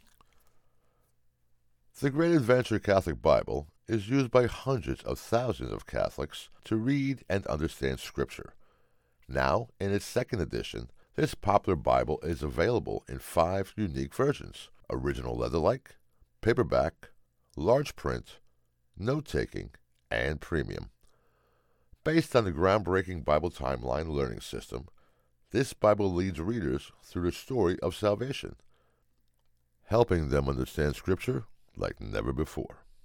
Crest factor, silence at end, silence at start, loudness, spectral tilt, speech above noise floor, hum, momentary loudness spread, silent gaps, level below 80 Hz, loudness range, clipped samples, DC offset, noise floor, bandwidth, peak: 22 dB; 0.3 s; 1.95 s; -30 LUFS; -6.5 dB/octave; 40 dB; none; 12 LU; none; -46 dBFS; 5 LU; under 0.1%; under 0.1%; -69 dBFS; 19 kHz; -8 dBFS